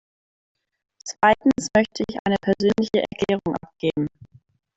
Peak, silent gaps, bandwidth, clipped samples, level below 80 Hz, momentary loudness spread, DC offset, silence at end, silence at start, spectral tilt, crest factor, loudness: -4 dBFS; 2.19-2.25 s; 8.2 kHz; under 0.1%; -54 dBFS; 10 LU; under 0.1%; 0.5 s; 1.05 s; -5 dB/octave; 20 dB; -22 LUFS